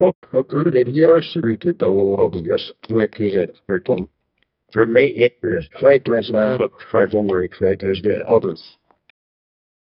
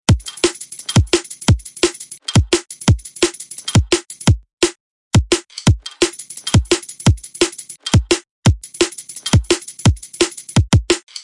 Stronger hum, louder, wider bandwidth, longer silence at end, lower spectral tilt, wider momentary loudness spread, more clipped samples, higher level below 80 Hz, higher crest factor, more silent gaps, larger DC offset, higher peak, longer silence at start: neither; about the same, -18 LUFS vs -17 LUFS; second, 5.6 kHz vs 11.5 kHz; first, 1.4 s vs 0.05 s; first, -10.5 dB/octave vs -4.5 dB/octave; first, 9 LU vs 4 LU; neither; second, -52 dBFS vs -28 dBFS; about the same, 18 dB vs 14 dB; second, 0.15-0.22 s vs 4.53-4.57 s, 4.80-5.11 s, 8.30-8.42 s; neither; about the same, 0 dBFS vs -2 dBFS; about the same, 0 s vs 0.1 s